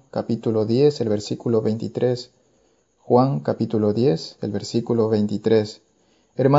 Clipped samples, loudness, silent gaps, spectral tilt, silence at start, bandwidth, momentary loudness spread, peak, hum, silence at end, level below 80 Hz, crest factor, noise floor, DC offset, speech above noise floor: under 0.1%; -22 LUFS; none; -7.5 dB/octave; 0.15 s; 7.8 kHz; 9 LU; -2 dBFS; none; 0 s; -64 dBFS; 18 dB; -62 dBFS; under 0.1%; 42 dB